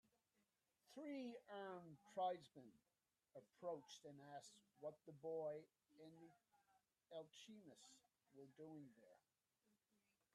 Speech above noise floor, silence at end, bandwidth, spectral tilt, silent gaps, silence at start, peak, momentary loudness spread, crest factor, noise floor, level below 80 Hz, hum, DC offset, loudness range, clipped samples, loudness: 34 dB; 1.15 s; 13 kHz; -5 dB/octave; none; 0.9 s; -36 dBFS; 18 LU; 20 dB; -90 dBFS; under -90 dBFS; none; under 0.1%; 10 LU; under 0.1%; -55 LUFS